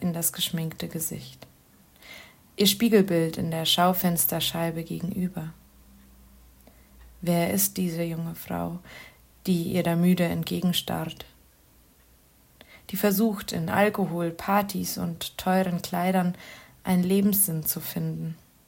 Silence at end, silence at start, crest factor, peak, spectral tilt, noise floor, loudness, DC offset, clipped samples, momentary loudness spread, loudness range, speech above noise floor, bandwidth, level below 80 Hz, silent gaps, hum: 0.3 s; 0 s; 20 dB; -8 dBFS; -4.5 dB/octave; -58 dBFS; -26 LUFS; under 0.1%; under 0.1%; 17 LU; 6 LU; 33 dB; 16.5 kHz; -58 dBFS; none; none